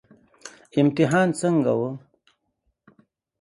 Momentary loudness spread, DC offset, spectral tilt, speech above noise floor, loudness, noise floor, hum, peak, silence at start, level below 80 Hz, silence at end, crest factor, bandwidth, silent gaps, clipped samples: 24 LU; under 0.1%; -6.5 dB/octave; 53 dB; -22 LUFS; -74 dBFS; none; -6 dBFS; 0.45 s; -66 dBFS; 1.4 s; 18 dB; 11.5 kHz; none; under 0.1%